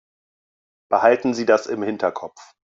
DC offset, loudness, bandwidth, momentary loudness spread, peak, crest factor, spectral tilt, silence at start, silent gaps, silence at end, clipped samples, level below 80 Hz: under 0.1%; -20 LUFS; 7.8 kHz; 12 LU; -2 dBFS; 20 dB; -5 dB/octave; 0.9 s; none; 0.3 s; under 0.1%; -68 dBFS